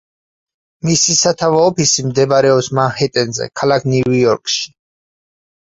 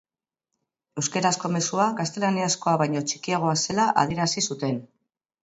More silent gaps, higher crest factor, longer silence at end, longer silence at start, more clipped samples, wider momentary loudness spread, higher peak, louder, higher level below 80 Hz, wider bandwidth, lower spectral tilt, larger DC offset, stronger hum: neither; about the same, 16 dB vs 20 dB; first, 1 s vs 0.6 s; about the same, 0.85 s vs 0.95 s; neither; about the same, 7 LU vs 7 LU; first, 0 dBFS vs -6 dBFS; first, -14 LUFS vs -24 LUFS; first, -52 dBFS vs -62 dBFS; about the same, 8.2 kHz vs 8.2 kHz; about the same, -4 dB/octave vs -4 dB/octave; neither; neither